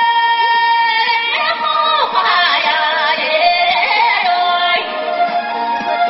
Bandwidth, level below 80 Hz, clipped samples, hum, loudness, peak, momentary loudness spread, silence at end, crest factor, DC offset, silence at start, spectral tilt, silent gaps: 6 kHz; -60 dBFS; under 0.1%; none; -13 LUFS; 0 dBFS; 5 LU; 0 s; 14 dB; under 0.1%; 0 s; 3.5 dB/octave; none